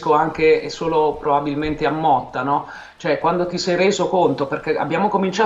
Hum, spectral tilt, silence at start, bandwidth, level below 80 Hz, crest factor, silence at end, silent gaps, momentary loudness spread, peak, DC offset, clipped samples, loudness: none; -5.5 dB/octave; 0 s; 8 kHz; -46 dBFS; 14 dB; 0 s; none; 6 LU; -4 dBFS; under 0.1%; under 0.1%; -19 LUFS